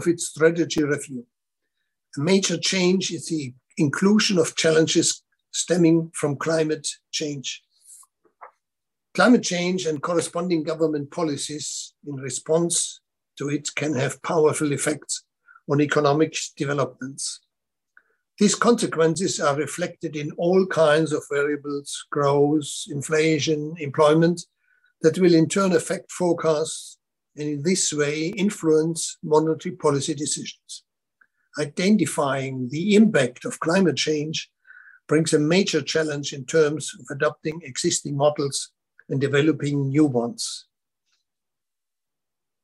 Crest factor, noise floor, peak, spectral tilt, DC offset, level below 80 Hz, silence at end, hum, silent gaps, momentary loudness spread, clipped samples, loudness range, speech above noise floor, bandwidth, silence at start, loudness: 18 dB; -88 dBFS; -4 dBFS; -4.5 dB/octave; under 0.1%; -68 dBFS; 2.05 s; none; none; 12 LU; under 0.1%; 4 LU; 66 dB; 12.5 kHz; 0 s; -22 LUFS